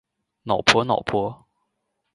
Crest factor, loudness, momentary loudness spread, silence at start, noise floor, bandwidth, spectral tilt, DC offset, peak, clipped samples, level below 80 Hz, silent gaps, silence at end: 24 dB; -21 LUFS; 13 LU; 0.45 s; -76 dBFS; 11.5 kHz; -3.5 dB/octave; under 0.1%; 0 dBFS; under 0.1%; -54 dBFS; none; 0.8 s